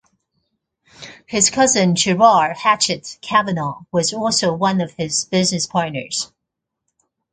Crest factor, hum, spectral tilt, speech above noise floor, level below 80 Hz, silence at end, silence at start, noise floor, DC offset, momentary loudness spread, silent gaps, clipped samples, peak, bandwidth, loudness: 18 dB; none; -3 dB/octave; 63 dB; -56 dBFS; 1.05 s; 1 s; -80 dBFS; under 0.1%; 11 LU; none; under 0.1%; 0 dBFS; 9.6 kHz; -17 LUFS